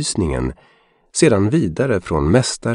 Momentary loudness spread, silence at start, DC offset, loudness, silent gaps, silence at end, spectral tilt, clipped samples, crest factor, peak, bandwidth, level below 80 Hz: 10 LU; 0 s; under 0.1%; -18 LUFS; none; 0 s; -5.5 dB/octave; under 0.1%; 16 dB; -2 dBFS; 11 kHz; -34 dBFS